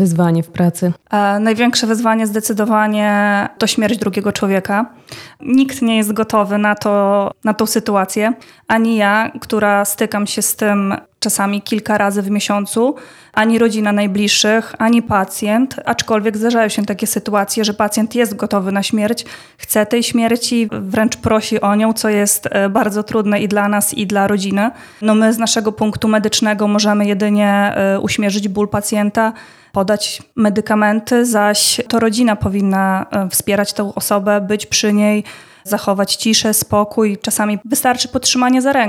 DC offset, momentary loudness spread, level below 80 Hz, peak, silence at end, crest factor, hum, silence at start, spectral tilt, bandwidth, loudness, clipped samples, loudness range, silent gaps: under 0.1%; 5 LU; -50 dBFS; 0 dBFS; 0 s; 14 dB; none; 0 s; -4 dB/octave; 16.5 kHz; -15 LUFS; under 0.1%; 2 LU; none